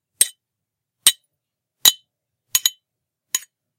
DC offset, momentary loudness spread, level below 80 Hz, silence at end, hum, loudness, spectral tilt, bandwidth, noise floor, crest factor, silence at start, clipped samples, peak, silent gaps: under 0.1%; 11 LU; -74 dBFS; 0.4 s; none; -18 LUFS; 3.5 dB/octave; 17 kHz; -83 dBFS; 24 dB; 0.2 s; under 0.1%; 0 dBFS; none